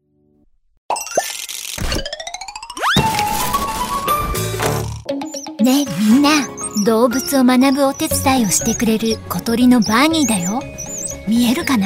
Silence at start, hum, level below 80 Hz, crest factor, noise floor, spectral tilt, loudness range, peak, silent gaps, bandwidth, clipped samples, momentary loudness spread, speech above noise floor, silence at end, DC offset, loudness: 0.9 s; none; -36 dBFS; 16 dB; -57 dBFS; -4 dB/octave; 5 LU; -2 dBFS; none; 16.5 kHz; under 0.1%; 12 LU; 42 dB; 0 s; under 0.1%; -17 LUFS